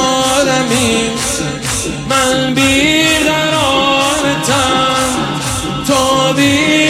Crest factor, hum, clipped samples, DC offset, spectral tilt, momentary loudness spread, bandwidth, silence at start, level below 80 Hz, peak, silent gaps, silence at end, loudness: 12 dB; none; under 0.1%; under 0.1%; -3 dB/octave; 7 LU; 16.5 kHz; 0 s; -34 dBFS; 0 dBFS; none; 0 s; -12 LUFS